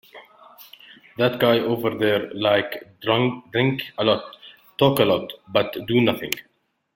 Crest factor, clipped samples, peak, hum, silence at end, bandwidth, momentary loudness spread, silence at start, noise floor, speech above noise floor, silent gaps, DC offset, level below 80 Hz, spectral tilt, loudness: 20 dB; under 0.1%; -2 dBFS; none; 0.55 s; 17 kHz; 11 LU; 0.15 s; -48 dBFS; 27 dB; none; under 0.1%; -60 dBFS; -5.5 dB/octave; -22 LUFS